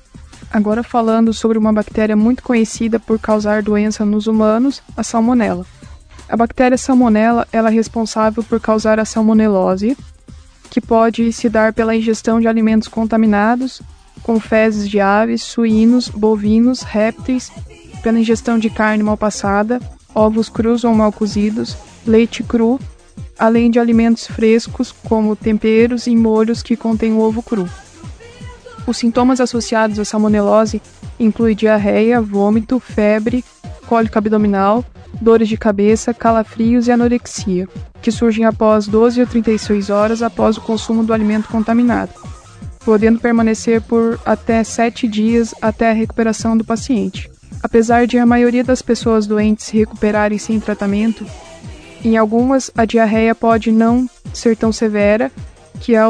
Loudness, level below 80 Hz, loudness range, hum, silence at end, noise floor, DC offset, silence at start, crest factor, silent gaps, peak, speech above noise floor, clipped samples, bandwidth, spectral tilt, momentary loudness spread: -14 LUFS; -38 dBFS; 2 LU; none; 0 s; -39 dBFS; under 0.1%; 0.15 s; 14 dB; none; 0 dBFS; 26 dB; under 0.1%; 10 kHz; -6 dB/octave; 10 LU